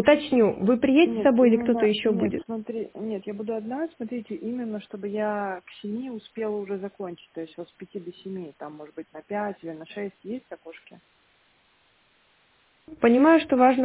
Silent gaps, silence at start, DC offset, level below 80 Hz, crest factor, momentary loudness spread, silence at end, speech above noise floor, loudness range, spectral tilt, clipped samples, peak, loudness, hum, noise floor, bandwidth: none; 0 s; under 0.1%; -62 dBFS; 20 dB; 20 LU; 0 s; 39 dB; 14 LU; -10 dB/octave; under 0.1%; -6 dBFS; -24 LUFS; none; -64 dBFS; 4 kHz